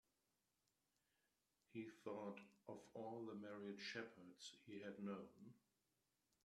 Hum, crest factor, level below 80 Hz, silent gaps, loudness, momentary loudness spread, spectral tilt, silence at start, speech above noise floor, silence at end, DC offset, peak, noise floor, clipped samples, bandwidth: none; 20 dB; under -90 dBFS; none; -55 LUFS; 8 LU; -5 dB/octave; 1.7 s; 35 dB; 0.85 s; under 0.1%; -36 dBFS; -90 dBFS; under 0.1%; 13 kHz